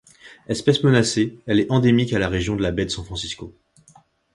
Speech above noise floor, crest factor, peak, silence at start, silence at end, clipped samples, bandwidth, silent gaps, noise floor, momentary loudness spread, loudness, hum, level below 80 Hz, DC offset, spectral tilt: 34 dB; 18 dB; -4 dBFS; 0.25 s; 0.85 s; under 0.1%; 11.5 kHz; none; -54 dBFS; 12 LU; -20 LUFS; none; -42 dBFS; under 0.1%; -5.5 dB/octave